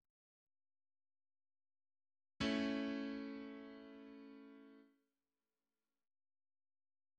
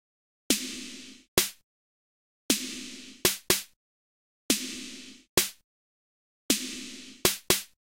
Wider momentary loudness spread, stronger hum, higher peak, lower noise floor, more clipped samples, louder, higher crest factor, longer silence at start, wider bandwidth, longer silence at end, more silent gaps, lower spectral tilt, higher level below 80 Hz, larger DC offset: first, 21 LU vs 15 LU; neither; second, -28 dBFS vs -2 dBFS; about the same, under -90 dBFS vs under -90 dBFS; neither; second, -43 LUFS vs -28 LUFS; second, 22 dB vs 32 dB; first, 2.4 s vs 0.5 s; second, 8.8 kHz vs 16 kHz; first, 2.35 s vs 0.35 s; second, none vs 1.28-1.37 s, 1.64-2.49 s, 3.76-4.49 s, 5.29-5.37 s, 5.64-6.49 s; first, -5 dB/octave vs -1.5 dB/octave; second, -74 dBFS vs -56 dBFS; neither